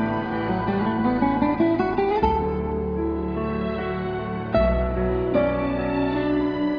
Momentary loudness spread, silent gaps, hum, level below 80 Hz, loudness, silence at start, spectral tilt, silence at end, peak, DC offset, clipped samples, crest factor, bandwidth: 5 LU; none; none; -34 dBFS; -23 LUFS; 0 s; -9.5 dB/octave; 0 s; -6 dBFS; under 0.1%; under 0.1%; 16 dB; 5.4 kHz